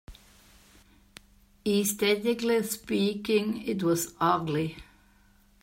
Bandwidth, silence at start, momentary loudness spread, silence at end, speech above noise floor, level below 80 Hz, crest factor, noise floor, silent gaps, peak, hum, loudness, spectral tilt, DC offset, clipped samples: 16 kHz; 0.1 s; 6 LU; 0.8 s; 34 dB; -58 dBFS; 18 dB; -61 dBFS; none; -10 dBFS; none; -28 LUFS; -4.5 dB/octave; under 0.1%; under 0.1%